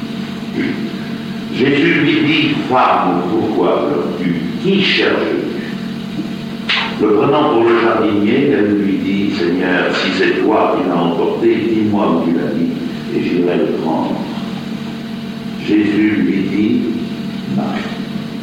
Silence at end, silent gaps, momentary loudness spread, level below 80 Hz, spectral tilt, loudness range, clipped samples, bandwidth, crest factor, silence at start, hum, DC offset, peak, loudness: 0 s; none; 11 LU; -52 dBFS; -6.5 dB/octave; 4 LU; under 0.1%; 15 kHz; 14 dB; 0 s; none; under 0.1%; -2 dBFS; -15 LUFS